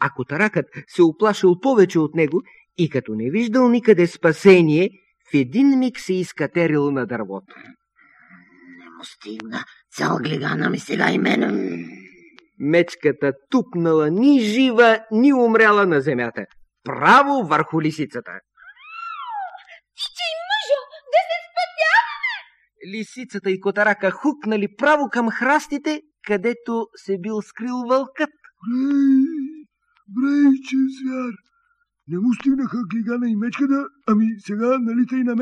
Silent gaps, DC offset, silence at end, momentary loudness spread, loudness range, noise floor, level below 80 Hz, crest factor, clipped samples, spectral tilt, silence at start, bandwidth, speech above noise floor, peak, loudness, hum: none; under 0.1%; 0 s; 16 LU; 9 LU; -67 dBFS; -68 dBFS; 20 dB; under 0.1%; -6 dB/octave; 0 s; 11 kHz; 48 dB; 0 dBFS; -19 LUFS; none